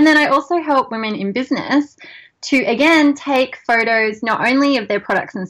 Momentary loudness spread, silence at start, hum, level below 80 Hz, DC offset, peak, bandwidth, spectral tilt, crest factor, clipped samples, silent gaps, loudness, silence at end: 9 LU; 0 s; none; -58 dBFS; under 0.1%; -4 dBFS; 12.5 kHz; -4.5 dB/octave; 12 dB; under 0.1%; none; -16 LUFS; 0 s